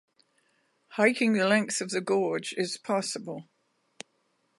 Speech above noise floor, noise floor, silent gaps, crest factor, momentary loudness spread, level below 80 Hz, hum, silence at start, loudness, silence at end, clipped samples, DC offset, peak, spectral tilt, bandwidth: 45 dB; -73 dBFS; none; 22 dB; 24 LU; -82 dBFS; none; 0.9 s; -27 LUFS; 1.15 s; under 0.1%; under 0.1%; -8 dBFS; -4 dB/octave; 11.5 kHz